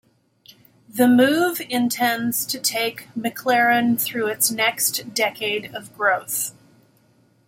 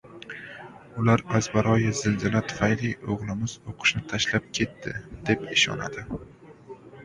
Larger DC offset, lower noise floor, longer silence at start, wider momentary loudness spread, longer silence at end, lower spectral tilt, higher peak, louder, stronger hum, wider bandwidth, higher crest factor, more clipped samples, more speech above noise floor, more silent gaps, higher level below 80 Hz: neither; first, -59 dBFS vs -46 dBFS; first, 0.95 s vs 0.05 s; second, 10 LU vs 18 LU; first, 0.95 s vs 0 s; second, -2.5 dB/octave vs -4.5 dB/octave; about the same, -4 dBFS vs -6 dBFS; first, -20 LUFS vs -25 LUFS; neither; first, 17 kHz vs 11 kHz; about the same, 18 dB vs 22 dB; neither; first, 38 dB vs 20 dB; neither; second, -68 dBFS vs -50 dBFS